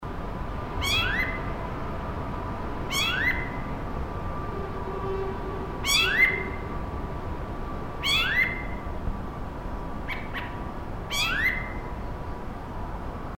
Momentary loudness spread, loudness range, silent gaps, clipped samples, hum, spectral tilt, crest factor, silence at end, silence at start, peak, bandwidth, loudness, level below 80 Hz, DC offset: 14 LU; 5 LU; none; under 0.1%; none; -3.5 dB/octave; 20 dB; 0.05 s; 0 s; -10 dBFS; 17 kHz; -28 LUFS; -36 dBFS; under 0.1%